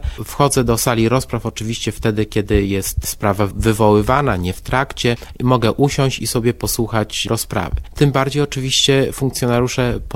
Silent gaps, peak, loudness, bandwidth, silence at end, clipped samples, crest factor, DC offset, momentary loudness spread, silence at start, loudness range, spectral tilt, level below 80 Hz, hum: none; 0 dBFS; -17 LUFS; 16.5 kHz; 0 s; under 0.1%; 16 dB; under 0.1%; 7 LU; 0 s; 1 LU; -5 dB/octave; -30 dBFS; none